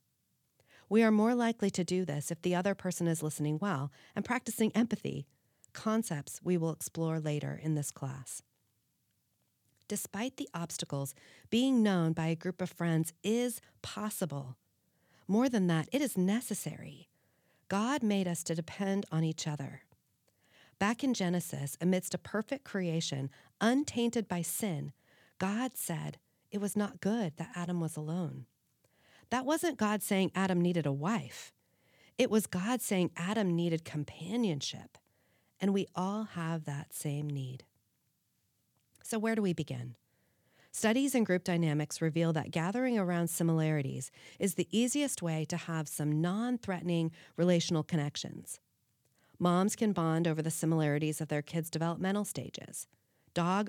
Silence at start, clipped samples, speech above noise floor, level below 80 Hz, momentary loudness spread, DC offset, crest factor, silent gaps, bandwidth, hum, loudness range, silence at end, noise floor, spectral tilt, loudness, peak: 0.9 s; under 0.1%; 45 dB; -78 dBFS; 11 LU; under 0.1%; 20 dB; none; 18 kHz; none; 5 LU; 0 s; -78 dBFS; -5.5 dB/octave; -33 LUFS; -14 dBFS